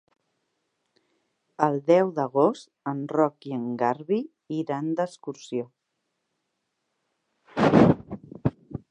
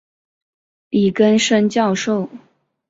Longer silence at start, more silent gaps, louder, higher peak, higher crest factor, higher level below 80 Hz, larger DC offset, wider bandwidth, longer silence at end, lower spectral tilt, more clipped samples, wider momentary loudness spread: first, 1.6 s vs 0.9 s; neither; second, -25 LUFS vs -16 LUFS; about the same, -4 dBFS vs -2 dBFS; first, 24 dB vs 16 dB; about the same, -56 dBFS vs -60 dBFS; neither; first, 10 kHz vs 8 kHz; second, 0.15 s vs 0.5 s; first, -8 dB/octave vs -5 dB/octave; neither; first, 14 LU vs 9 LU